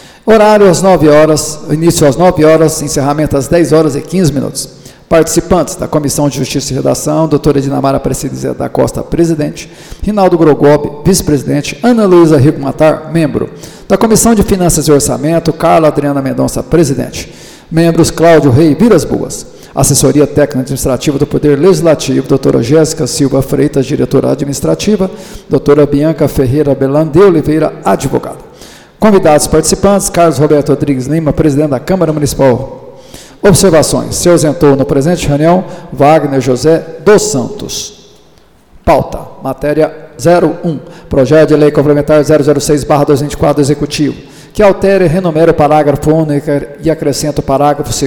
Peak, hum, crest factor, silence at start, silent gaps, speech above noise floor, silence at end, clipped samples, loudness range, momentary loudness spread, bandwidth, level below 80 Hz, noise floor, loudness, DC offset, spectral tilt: 0 dBFS; none; 8 dB; 0.25 s; none; 35 dB; 0 s; 0.2%; 3 LU; 9 LU; 19.5 kHz; -30 dBFS; -44 dBFS; -9 LUFS; under 0.1%; -5.5 dB/octave